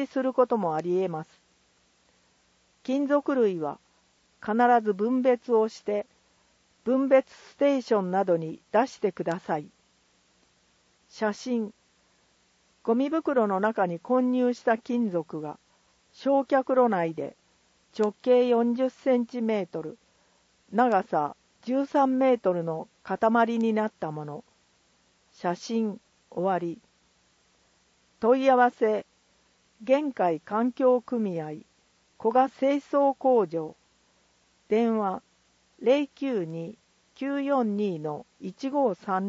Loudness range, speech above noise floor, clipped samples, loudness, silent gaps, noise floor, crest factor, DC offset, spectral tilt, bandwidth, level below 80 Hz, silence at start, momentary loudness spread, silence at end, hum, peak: 6 LU; 41 dB; under 0.1%; -26 LUFS; none; -66 dBFS; 18 dB; under 0.1%; -7 dB/octave; 7.8 kHz; -76 dBFS; 0 s; 14 LU; 0 s; none; -8 dBFS